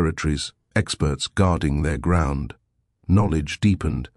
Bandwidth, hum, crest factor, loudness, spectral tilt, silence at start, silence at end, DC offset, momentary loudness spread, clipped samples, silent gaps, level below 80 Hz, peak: 11.5 kHz; none; 18 dB; -22 LUFS; -6 dB/octave; 0 s; 0.1 s; under 0.1%; 7 LU; under 0.1%; none; -32 dBFS; -4 dBFS